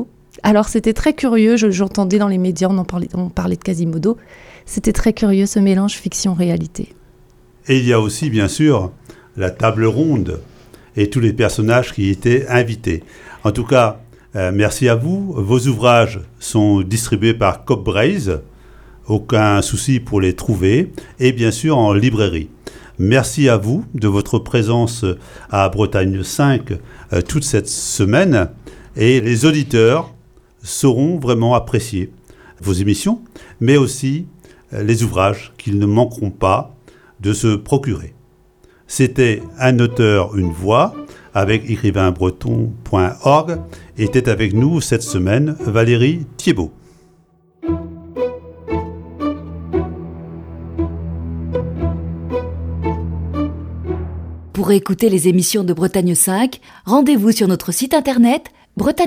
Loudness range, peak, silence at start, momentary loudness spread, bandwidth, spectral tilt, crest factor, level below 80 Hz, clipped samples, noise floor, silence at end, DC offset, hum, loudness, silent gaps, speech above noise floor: 8 LU; 0 dBFS; 0 s; 12 LU; 16.5 kHz; -6 dB/octave; 16 dB; -36 dBFS; under 0.1%; -53 dBFS; 0 s; under 0.1%; none; -16 LUFS; none; 38 dB